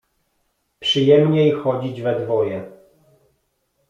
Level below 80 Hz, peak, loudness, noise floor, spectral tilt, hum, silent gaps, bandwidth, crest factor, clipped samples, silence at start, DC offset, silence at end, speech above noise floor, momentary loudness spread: -62 dBFS; -2 dBFS; -18 LUFS; -69 dBFS; -7 dB/octave; none; none; 7.6 kHz; 18 dB; under 0.1%; 0.8 s; under 0.1%; 1.2 s; 52 dB; 11 LU